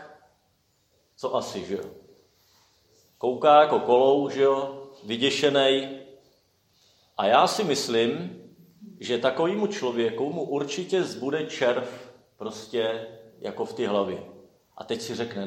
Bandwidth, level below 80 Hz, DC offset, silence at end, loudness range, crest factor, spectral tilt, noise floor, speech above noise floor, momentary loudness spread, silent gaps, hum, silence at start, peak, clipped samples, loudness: 16 kHz; -74 dBFS; under 0.1%; 0 s; 9 LU; 22 dB; -4 dB/octave; -68 dBFS; 44 dB; 18 LU; none; none; 0 s; -4 dBFS; under 0.1%; -25 LUFS